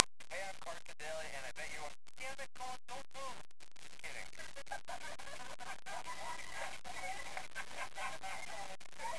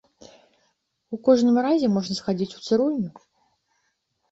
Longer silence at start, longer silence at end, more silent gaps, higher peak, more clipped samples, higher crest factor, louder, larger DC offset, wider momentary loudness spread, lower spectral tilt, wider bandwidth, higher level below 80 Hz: second, 0 s vs 1.1 s; second, 0 s vs 1.2 s; neither; first, 0 dBFS vs -6 dBFS; neither; first, 46 dB vs 18 dB; second, -46 LUFS vs -22 LUFS; first, 0.8% vs under 0.1%; second, 6 LU vs 11 LU; second, -1.5 dB/octave vs -6.5 dB/octave; first, 11 kHz vs 8 kHz; about the same, -68 dBFS vs -64 dBFS